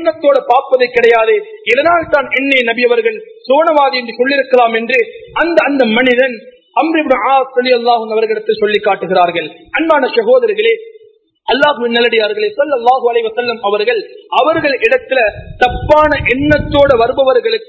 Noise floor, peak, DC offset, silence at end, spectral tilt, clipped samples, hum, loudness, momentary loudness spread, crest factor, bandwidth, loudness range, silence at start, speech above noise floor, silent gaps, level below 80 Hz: -46 dBFS; 0 dBFS; under 0.1%; 0.05 s; -6 dB/octave; 0.3%; none; -12 LUFS; 6 LU; 12 dB; 8 kHz; 2 LU; 0 s; 35 dB; none; -38 dBFS